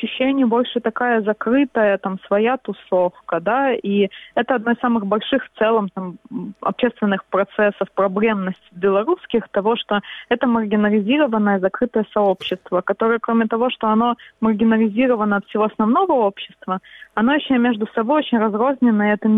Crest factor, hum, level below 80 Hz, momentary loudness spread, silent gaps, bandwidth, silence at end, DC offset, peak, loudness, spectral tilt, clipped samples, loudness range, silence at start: 16 dB; none; -60 dBFS; 7 LU; none; 4 kHz; 0 s; under 0.1%; -4 dBFS; -19 LUFS; -8.5 dB/octave; under 0.1%; 2 LU; 0 s